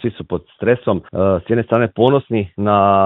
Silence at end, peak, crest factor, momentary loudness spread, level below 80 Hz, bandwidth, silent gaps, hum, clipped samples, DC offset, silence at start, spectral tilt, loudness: 0 s; 0 dBFS; 16 dB; 8 LU; -52 dBFS; 4.1 kHz; none; none; under 0.1%; under 0.1%; 0 s; -10.5 dB/octave; -17 LUFS